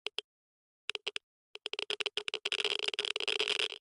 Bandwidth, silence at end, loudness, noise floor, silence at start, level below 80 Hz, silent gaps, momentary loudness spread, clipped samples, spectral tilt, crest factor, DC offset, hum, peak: 11.5 kHz; 0.05 s; -34 LUFS; under -90 dBFS; 0.05 s; -84 dBFS; 0.24-0.88 s, 1.23-1.54 s; 12 LU; under 0.1%; 0.5 dB/octave; 22 dB; under 0.1%; none; -16 dBFS